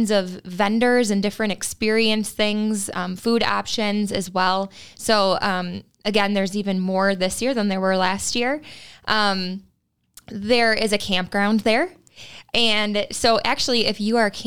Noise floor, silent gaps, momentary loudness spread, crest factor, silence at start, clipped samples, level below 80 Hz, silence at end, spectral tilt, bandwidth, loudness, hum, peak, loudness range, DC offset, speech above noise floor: -67 dBFS; none; 10 LU; 18 dB; 0 s; under 0.1%; -52 dBFS; 0 s; -3.5 dB/octave; 18 kHz; -21 LUFS; none; -4 dBFS; 2 LU; 1%; 46 dB